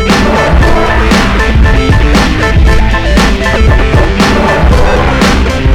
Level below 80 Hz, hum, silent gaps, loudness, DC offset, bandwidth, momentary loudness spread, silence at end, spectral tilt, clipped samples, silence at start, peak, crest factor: -10 dBFS; none; none; -8 LUFS; under 0.1%; 14 kHz; 1 LU; 0 s; -5.5 dB/octave; 2%; 0 s; 0 dBFS; 6 dB